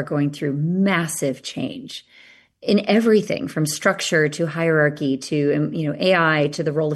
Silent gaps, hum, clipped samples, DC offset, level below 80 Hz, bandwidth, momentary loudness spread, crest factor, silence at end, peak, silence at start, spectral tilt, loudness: none; none; under 0.1%; under 0.1%; -64 dBFS; 12.5 kHz; 11 LU; 16 dB; 0 s; -4 dBFS; 0 s; -5 dB/octave; -20 LUFS